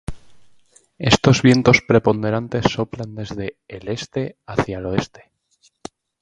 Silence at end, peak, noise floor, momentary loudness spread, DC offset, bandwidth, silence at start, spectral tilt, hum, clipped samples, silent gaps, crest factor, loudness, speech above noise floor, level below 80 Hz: 1.15 s; 0 dBFS; -60 dBFS; 21 LU; under 0.1%; 10.5 kHz; 0.1 s; -5.5 dB/octave; none; under 0.1%; none; 20 dB; -19 LUFS; 42 dB; -44 dBFS